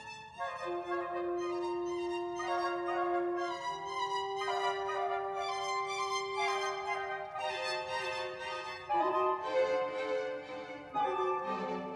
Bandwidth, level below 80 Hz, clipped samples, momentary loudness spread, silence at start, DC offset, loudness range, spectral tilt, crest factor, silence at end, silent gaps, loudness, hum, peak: 11.5 kHz; -72 dBFS; under 0.1%; 7 LU; 0 s; under 0.1%; 1 LU; -3.5 dB/octave; 16 dB; 0 s; none; -35 LUFS; none; -20 dBFS